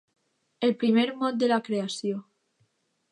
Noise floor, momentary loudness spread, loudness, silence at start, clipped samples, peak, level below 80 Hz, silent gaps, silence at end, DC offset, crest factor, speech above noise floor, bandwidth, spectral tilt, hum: -71 dBFS; 9 LU; -26 LUFS; 0.6 s; under 0.1%; -12 dBFS; -80 dBFS; none; 0.9 s; under 0.1%; 16 dB; 46 dB; 11 kHz; -5 dB/octave; none